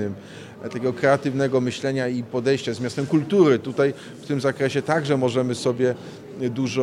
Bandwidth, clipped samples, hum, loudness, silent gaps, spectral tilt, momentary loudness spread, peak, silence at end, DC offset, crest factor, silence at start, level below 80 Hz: 12 kHz; under 0.1%; none; -22 LUFS; none; -6 dB/octave; 13 LU; -4 dBFS; 0 s; under 0.1%; 18 dB; 0 s; -66 dBFS